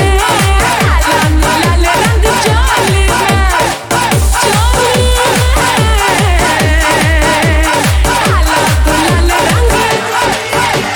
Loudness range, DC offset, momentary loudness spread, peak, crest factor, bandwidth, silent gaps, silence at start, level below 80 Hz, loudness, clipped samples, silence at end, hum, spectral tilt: 1 LU; under 0.1%; 2 LU; 0 dBFS; 10 dB; over 20 kHz; none; 0 s; -14 dBFS; -10 LUFS; under 0.1%; 0 s; none; -4 dB/octave